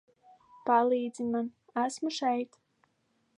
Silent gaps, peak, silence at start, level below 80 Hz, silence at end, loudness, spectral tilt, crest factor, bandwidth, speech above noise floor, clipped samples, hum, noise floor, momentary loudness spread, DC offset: none; -12 dBFS; 0.65 s; -80 dBFS; 0.9 s; -31 LUFS; -4 dB/octave; 20 dB; 11 kHz; 45 dB; under 0.1%; none; -74 dBFS; 10 LU; under 0.1%